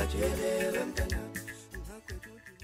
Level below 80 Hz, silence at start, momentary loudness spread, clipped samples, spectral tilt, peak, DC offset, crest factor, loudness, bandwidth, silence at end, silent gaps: -40 dBFS; 0 s; 15 LU; under 0.1%; -5 dB/octave; -18 dBFS; under 0.1%; 16 dB; -34 LUFS; 16 kHz; 0 s; none